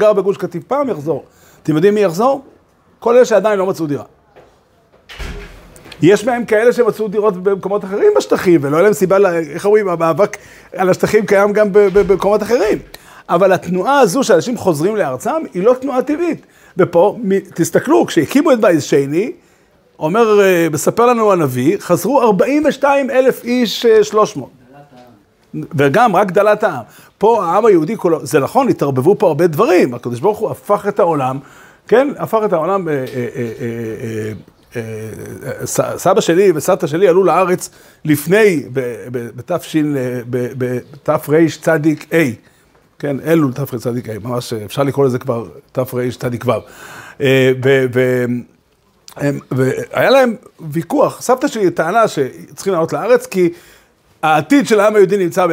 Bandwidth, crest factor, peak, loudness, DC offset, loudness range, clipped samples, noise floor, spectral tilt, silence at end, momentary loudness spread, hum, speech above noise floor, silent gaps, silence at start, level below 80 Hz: 16.5 kHz; 14 dB; 0 dBFS; -14 LUFS; under 0.1%; 5 LU; under 0.1%; -55 dBFS; -6 dB/octave; 0 s; 12 LU; none; 41 dB; none; 0 s; -48 dBFS